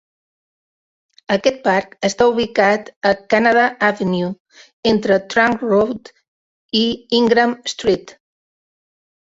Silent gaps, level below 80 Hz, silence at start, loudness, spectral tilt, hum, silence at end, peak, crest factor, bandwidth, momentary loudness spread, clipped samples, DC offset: 2.96-3.01 s, 4.40-4.45 s, 4.73-4.83 s, 6.28-6.69 s; -54 dBFS; 1.3 s; -17 LUFS; -4.5 dB/octave; none; 1.3 s; -2 dBFS; 18 dB; 8 kHz; 8 LU; under 0.1%; under 0.1%